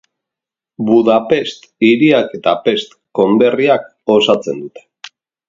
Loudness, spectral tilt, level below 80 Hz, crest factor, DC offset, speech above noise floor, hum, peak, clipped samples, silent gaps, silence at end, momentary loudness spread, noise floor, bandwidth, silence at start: -13 LUFS; -6 dB/octave; -58 dBFS; 14 dB; under 0.1%; 73 dB; none; 0 dBFS; under 0.1%; none; 0.4 s; 12 LU; -86 dBFS; 7.6 kHz; 0.8 s